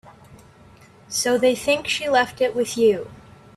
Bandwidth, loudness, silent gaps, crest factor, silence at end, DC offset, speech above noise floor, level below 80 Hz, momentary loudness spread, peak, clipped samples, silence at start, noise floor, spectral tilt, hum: 14 kHz; -21 LUFS; none; 16 dB; 0.35 s; under 0.1%; 29 dB; -58 dBFS; 8 LU; -6 dBFS; under 0.1%; 0.3 s; -49 dBFS; -2.5 dB/octave; none